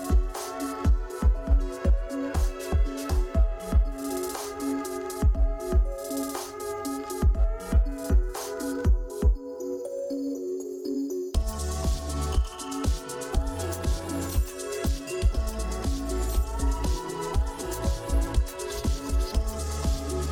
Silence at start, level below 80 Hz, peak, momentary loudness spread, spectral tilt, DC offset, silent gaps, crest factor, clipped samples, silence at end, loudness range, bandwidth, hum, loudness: 0 s; -28 dBFS; -12 dBFS; 6 LU; -6 dB/octave; under 0.1%; none; 14 dB; under 0.1%; 0 s; 2 LU; 17 kHz; none; -29 LUFS